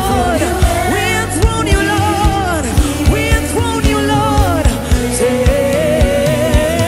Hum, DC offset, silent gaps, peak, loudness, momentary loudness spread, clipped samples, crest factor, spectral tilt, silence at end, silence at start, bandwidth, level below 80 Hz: none; under 0.1%; none; 0 dBFS; -13 LUFS; 2 LU; under 0.1%; 12 dB; -5 dB/octave; 0 s; 0 s; 16 kHz; -18 dBFS